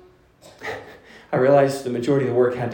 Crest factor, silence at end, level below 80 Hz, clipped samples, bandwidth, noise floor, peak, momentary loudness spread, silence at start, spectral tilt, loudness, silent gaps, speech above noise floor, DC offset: 18 dB; 0 s; -62 dBFS; under 0.1%; 17 kHz; -50 dBFS; -4 dBFS; 17 LU; 0.6 s; -7 dB/octave; -20 LUFS; none; 31 dB; under 0.1%